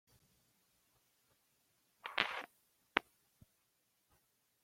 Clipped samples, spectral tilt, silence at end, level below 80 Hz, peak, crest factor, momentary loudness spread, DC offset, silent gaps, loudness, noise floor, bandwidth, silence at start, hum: under 0.1%; -2.5 dB/octave; 1.6 s; -82 dBFS; -8 dBFS; 40 dB; 14 LU; under 0.1%; none; -40 LUFS; -80 dBFS; 16.5 kHz; 2.05 s; none